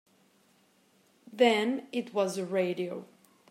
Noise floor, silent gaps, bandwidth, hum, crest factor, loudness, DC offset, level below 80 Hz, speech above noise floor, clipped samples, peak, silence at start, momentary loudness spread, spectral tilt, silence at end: -66 dBFS; none; 15.5 kHz; none; 22 dB; -29 LUFS; under 0.1%; -88 dBFS; 37 dB; under 0.1%; -10 dBFS; 1.3 s; 14 LU; -4.5 dB/octave; 0.45 s